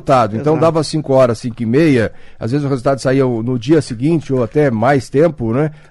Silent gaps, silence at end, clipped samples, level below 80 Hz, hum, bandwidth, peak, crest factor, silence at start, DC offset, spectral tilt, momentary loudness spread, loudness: none; 0.15 s; under 0.1%; -42 dBFS; none; 12 kHz; -2 dBFS; 12 dB; 0.05 s; under 0.1%; -7 dB/octave; 6 LU; -15 LUFS